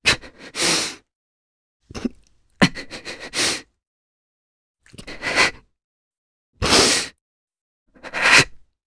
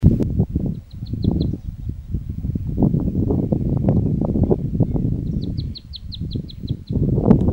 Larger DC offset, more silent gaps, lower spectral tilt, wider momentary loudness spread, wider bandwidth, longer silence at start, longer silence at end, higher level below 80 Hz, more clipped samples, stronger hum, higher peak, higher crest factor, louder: neither; first, 1.15-1.80 s, 3.87-4.74 s, 5.84-6.11 s, 6.18-6.53 s, 7.21-7.48 s, 7.61-7.86 s vs none; second, -2 dB/octave vs -10.5 dB/octave; first, 19 LU vs 11 LU; first, 11 kHz vs 5.2 kHz; about the same, 0.05 s vs 0 s; first, 0.3 s vs 0 s; second, -46 dBFS vs -30 dBFS; neither; neither; about the same, 0 dBFS vs 0 dBFS; about the same, 24 dB vs 20 dB; first, -18 LUFS vs -22 LUFS